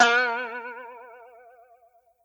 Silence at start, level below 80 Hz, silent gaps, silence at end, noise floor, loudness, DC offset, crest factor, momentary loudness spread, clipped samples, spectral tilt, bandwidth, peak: 0 s; -78 dBFS; none; 1.1 s; -61 dBFS; -25 LUFS; under 0.1%; 22 dB; 26 LU; under 0.1%; 0 dB/octave; 19.5 kHz; -6 dBFS